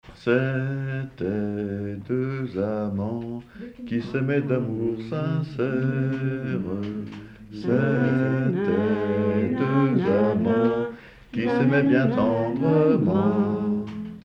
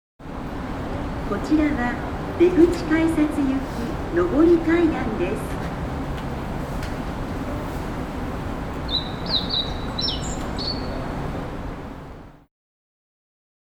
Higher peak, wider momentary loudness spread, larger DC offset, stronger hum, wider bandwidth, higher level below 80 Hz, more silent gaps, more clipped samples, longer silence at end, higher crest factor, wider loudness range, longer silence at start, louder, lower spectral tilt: second, -8 dBFS vs -4 dBFS; about the same, 12 LU vs 13 LU; neither; neither; second, 6.4 kHz vs 16.5 kHz; second, -54 dBFS vs -34 dBFS; neither; neither; second, 0.05 s vs 1.25 s; about the same, 16 dB vs 20 dB; second, 6 LU vs 9 LU; second, 0.05 s vs 0.2 s; about the same, -24 LUFS vs -24 LUFS; first, -9.5 dB/octave vs -6 dB/octave